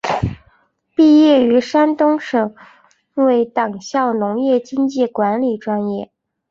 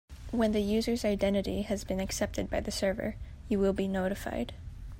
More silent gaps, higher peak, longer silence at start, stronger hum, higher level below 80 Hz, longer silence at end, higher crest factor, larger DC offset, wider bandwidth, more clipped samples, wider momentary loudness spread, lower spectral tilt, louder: neither; first, -2 dBFS vs -16 dBFS; about the same, 0.05 s vs 0.1 s; neither; about the same, -46 dBFS vs -44 dBFS; first, 0.45 s vs 0 s; about the same, 14 dB vs 16 dB; neither; second, 7.6 kHz vs 16 kHz; neither; first, 13 LU vs 8 LU; about the same, -6.5 dB/octave vs -5.5 dB/octave; first, -16 LUFS vs -31 LUFS